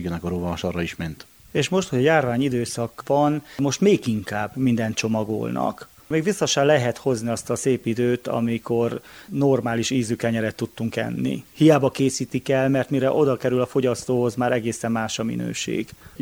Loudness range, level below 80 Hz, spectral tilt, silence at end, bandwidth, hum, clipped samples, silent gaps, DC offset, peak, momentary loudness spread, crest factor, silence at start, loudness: 2 LU; -54 dBFS; -5.5 dB/octave; 0 s; over 20 kHz; none; under 0.1%; none; under 0.1%; -4 dBFS; 9 LU; 20 dB; 0 s; -23 LUFS